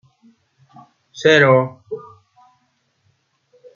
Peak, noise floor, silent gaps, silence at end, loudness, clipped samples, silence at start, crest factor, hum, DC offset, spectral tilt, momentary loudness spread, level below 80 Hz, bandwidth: -2 dBFS; -65 dBFS; none; 1.8 s; -14 LUFS; under 0.1%; 1.15 s; 20 dB; none; under 0.1%; -5.5 dB/octave; 21 LU; -68 dBFS; 7.4 kHz